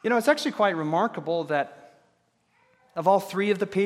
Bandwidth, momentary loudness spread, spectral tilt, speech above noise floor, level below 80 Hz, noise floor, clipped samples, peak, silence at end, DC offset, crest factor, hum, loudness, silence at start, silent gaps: 16 kHz; 6 LU; -5.5 dB/octave; 44 dB; -78 dBFS; -68 dBFS; under 0.1%; -8 dBFS; 0 s; under 0.1%; 18 dB; none; -25 LUFS; 0.05 s; none